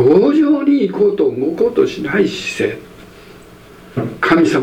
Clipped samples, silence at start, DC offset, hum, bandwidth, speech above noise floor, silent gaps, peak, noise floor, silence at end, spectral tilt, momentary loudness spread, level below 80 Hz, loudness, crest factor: under 0.1%; 0 s; under 0.1%; none; 13.5 kHz; 25 dB; none; 0 dBFS; -39 dBFS; 0 s; -6.5 dB/octave; 11 LU; -50 dBFS; -15 LUFS; 14 dB